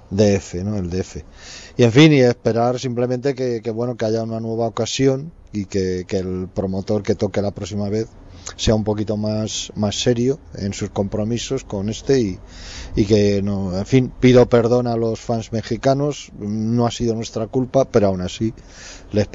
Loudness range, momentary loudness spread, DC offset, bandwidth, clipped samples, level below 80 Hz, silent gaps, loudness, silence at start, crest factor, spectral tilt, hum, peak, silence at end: 5 LU; 12 LU; under 0.1%; 8 kHz; under 0.1%; -40 dBFS; none; -19 LUFS; 0.1 s; 16 dB; -6 dB/octave; none; -2 dBFS; 0 s